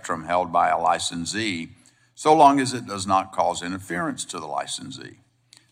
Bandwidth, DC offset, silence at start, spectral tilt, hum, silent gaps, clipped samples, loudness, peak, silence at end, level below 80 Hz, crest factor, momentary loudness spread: 15 kHz; under 0.1%; 0.05 s; -3.5 dB/octave; none; none; under 0.1%; -23 LUFS; -4 dBFS; 0.65 s; -64 dBFS; 20 dB; 15 LU